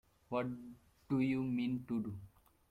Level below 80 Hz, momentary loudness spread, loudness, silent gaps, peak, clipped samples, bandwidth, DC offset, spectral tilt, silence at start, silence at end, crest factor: -68 dBFS; 15 LU; -39 LUFS; none; -24 dBFS; under 0.1%; 11 kHz; under 0.1%; -8.5 dB/octave; 0.3 s; 0.4 s; 16 dB